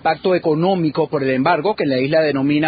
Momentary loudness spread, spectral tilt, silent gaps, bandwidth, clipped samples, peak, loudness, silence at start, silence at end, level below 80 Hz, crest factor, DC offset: 2 LU; -5 dB/octave; none; 5 kHz; under 0.1%; -2 dBFS; -17 LUFS; 0.05 s; 0 s; -56 dBFS; 14 dB; under 0.1%